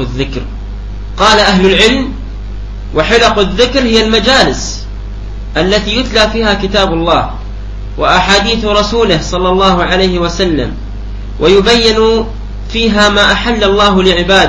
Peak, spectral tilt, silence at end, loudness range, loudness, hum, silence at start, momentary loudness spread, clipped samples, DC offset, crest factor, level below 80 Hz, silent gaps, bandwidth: 0 dBFS; -4 dB/octave; 0 s; 2 LU; -9 LUFS; 50 Hz at -20 dBFS; 0 s; 18 LU; 0.4%; 0.8%; 10 dB; -22 dBFS; none; 11 kHz